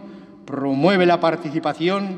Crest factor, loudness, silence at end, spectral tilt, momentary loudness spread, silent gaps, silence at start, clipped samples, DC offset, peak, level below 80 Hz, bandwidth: 16 dB; -19 LUFS; 0 s; -7 dB/octave; 10 LU; none; 0 s; under 0.1%; under 0.1%; -4 dBFS; -68 dBFS; 9 kHz